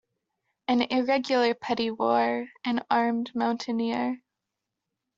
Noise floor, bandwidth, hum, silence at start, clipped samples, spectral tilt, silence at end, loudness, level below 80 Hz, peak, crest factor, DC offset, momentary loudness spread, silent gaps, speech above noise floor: -85 dBFS; 7.6 kHz; none; 0.7 s; under 0.1%; -5 dB/octave; 1 s; -27 LUFS; -72 dBFS; -8 dBFS; 20 dB; under 0.1%; 6 LU; none; 59 dB